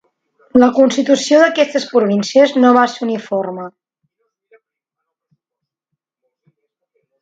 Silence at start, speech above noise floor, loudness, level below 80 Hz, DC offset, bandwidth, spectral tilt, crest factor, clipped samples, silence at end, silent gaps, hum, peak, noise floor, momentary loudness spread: 0.55 s; 69 dB; -13 LUFS; -62 dBFS; under 0.1%; 8 kHz; -4.5 dB/octave; 16 dB; under 0.1%; 3.5 s; none; none; 0 dBFS; -82 dBFS; 11 LU